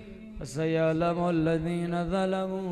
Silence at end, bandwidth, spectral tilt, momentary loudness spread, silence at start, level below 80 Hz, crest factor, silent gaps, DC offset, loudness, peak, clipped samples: 0 s; 11.5 kHz; -7 dB/octave; 10 LU; 0 s; -48 dBFS; 14 dB; none; under 0.1%; -28 LUFS; -16 dBFS; under 0.1%